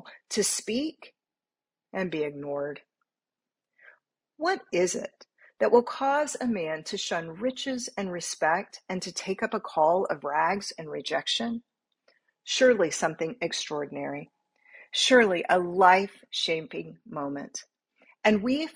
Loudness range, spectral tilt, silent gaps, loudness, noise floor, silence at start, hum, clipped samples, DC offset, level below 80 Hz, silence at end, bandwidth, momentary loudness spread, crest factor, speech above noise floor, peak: 9 LU; -3 dB/octave; none; -27 LUFS; under -90 dBFS; 0.05 s; none; under 0.1%; under 0.1%; -70 dBFS; 0.05 s; 15.5 kHz; 15 LU; 24 dB; over 63 dB; -6 dBFS